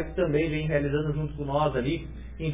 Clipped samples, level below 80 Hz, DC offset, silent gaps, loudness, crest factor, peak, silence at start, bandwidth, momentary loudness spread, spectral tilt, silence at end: under 0.1%; -40 dBFS; 0.3%; none; -28 LUFS; 16 dB; -12 dBFS; 0 s; 3.8 kHz; 8 LU; -11 dB/octave; 0 s